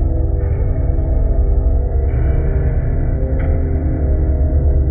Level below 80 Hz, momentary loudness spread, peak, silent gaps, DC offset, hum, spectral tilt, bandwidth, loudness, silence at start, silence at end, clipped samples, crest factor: -16 dBFS; 3 LU; -4 dBFS; none; under 0.1%; none; -14.5 dB/octave; 2.5 kHz; -18 LUFS; 0 s; 0 s; under 0.1%; 10 dB